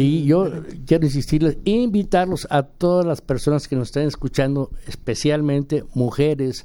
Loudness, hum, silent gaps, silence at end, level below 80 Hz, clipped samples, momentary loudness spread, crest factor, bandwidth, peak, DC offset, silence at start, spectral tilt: -20 LUFS; none; none; 0 s; -36 dBFS; under 0.1%; 6 LU; 16 dB; 16.5 kHz; -4 dBFS; under 0.1%; 0 s; -7 dB/octave